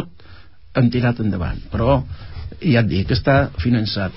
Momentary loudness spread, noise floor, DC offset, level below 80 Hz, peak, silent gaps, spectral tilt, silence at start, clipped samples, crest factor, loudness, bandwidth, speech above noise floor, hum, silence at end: 13 LU; -45 dBFS; 0.9%; -32 dBFS; -4 dBFS; none; -11.5 dB/octave; 0 s; under 0.1%; 14 dB; -19 LUFS; 5.8 kHz; 26 dB; none; 0 s